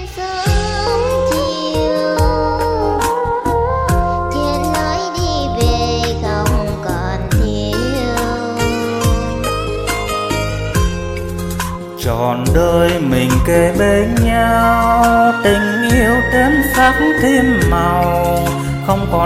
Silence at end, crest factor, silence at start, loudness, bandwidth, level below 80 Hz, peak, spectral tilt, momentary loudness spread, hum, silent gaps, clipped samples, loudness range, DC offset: 0 s; 14 dB; 0 s; -15 LUFS; 16.5 kHz; -24 dBFS; 0 dBFS; -5.5 dB/octave; 7 LU; none; none; under 0.1%; 6 LU; under 0.1%